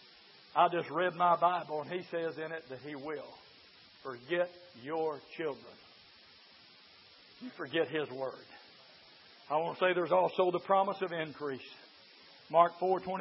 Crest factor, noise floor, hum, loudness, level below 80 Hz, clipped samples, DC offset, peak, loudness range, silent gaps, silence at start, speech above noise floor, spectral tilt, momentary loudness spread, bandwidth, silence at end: 24 dB; -59 dBFS; none; -33 LUFS; -82 dBFS; under 0.1%; under 0.1%; -12 dBFS; 9 LU; none; 0.55 s; 26 dB; -3 dB/octave; 20 LU; 5.8 kHz; 0 s